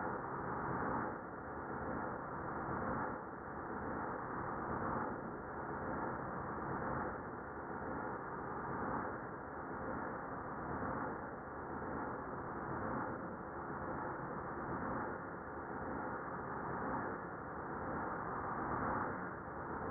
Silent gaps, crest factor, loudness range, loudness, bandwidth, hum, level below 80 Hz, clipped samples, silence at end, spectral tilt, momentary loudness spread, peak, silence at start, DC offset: none; 16 dB; 2 LU; -43 LUFS; 2.5 kHz; none; -62 dBFS; under 0.1%; 0 s; -2.5 dB/octave; 6 LU; -26 dBFS; 0 s; under 0.1%